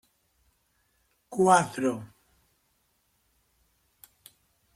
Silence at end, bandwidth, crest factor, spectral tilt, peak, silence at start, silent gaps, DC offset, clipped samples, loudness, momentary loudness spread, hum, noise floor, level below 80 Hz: 2.7 s; 15.5 kHz; 26 dB; -5 dB/octave; -6 dBFS; 1.3 s; none; under 0.1%; under 0.1%; -25 LUFS; 18 LU; none; -72 dBFS; -70 dBFS